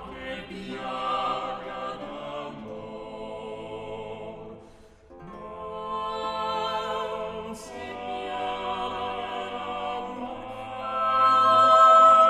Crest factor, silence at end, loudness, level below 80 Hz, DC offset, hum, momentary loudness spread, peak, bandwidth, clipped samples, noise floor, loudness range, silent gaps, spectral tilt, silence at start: 20 dB; 0 s; -25 LUFS; -56 dBFS; under 0.1%; none; 20 LU; -6 dBFS; 11.5 kHz; under 0.1%; -51 dBFS; 14 LU; none; -4 dB/octave; 0 s